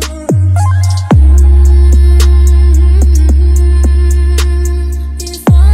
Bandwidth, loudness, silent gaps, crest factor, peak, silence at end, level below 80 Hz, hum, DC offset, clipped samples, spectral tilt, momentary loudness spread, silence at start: 12.5 kHz; -9 LUFS; none; 6 dB; 0 dBFS; 0 s; -8 dBFS; none; under 0.1%; under 0.1%; -6.5 dB/octave; 8 LU; 0 s